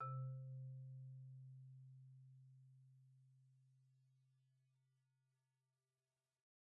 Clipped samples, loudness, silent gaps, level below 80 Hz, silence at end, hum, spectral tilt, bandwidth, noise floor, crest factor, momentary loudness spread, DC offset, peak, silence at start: under 0.1%; -56 LUFS; none; under -90 dBFS; 2.35 s; none; -6.5 dB/octave; 1.7 kHz; under -90 dBFS; 18 dB; 17 LU; under 0.1%; -40 dBFS; 0 s